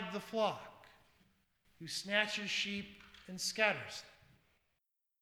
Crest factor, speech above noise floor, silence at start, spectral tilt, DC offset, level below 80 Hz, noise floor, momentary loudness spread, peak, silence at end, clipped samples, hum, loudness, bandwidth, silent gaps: 26 dB; 47 dB; 0 s; -2.5 dB/octave; under 0.1%; -76 dBFS; -85 dBFS; 19 LU; -16 dBFS; 1.05 s; under 0.1%; none; -36 LUFS; over 20 kHz; none